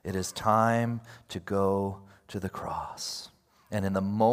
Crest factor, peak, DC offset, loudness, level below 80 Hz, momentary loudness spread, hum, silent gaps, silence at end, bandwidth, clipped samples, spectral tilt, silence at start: 20 dB; -8 dBFS; under 0.1%; -30 LUFS; -62 dBFS; 16 LU; none; none; 0 s; 16 kHz; under 0.1%; -5.5 dB/octave; 0.05 s